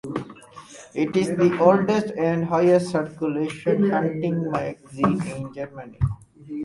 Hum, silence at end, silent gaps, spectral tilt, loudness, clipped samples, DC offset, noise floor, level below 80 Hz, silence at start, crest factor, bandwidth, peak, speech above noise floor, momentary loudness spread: none; 0 s; none; -7.5 dB/octave; -22 LUFS; under 0.1%; under 0.1%; -44 dBFS; -48 dBFS; 0.05 s; 20 dB; 11.5 kHz; -2 dBFS; 22 dB; 17 LU